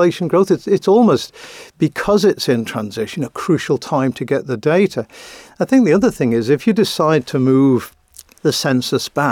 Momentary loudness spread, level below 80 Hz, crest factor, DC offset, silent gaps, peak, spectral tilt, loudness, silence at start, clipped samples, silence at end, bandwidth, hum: 11 LU; -52 dBFS; 12 dB; under 0.1%; none; -4 dBFS; -6 dB/octave; -16 LUFS; 0 s; under 0.1%; 0 s; 17 kHz; none